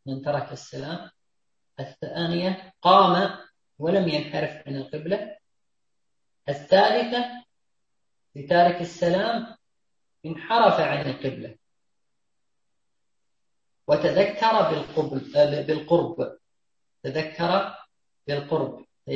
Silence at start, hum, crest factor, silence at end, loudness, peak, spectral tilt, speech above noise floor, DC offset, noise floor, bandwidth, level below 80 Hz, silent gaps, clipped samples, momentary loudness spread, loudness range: 0.05 s; none; 22 dB; 0 s; -24 LUFS; -4 dBFS; -6.5 dB/octave; 60 dB; under 0.1%; -84 dBFS; 7.6 kHz; -64 dBFS; none; under 0.1%; 19 LU; 5 LU